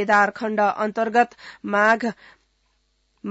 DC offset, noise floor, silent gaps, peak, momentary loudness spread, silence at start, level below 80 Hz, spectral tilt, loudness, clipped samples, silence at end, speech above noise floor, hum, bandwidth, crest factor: under 0.1%; -67 dBFS; none; -6 dBFS; 11 LU; 0 s; -66 dBFS; -5 dB/octave; -21 LUFS; under 0.1%; 0 s; 46 dB; none; 8 kHz; 16 dB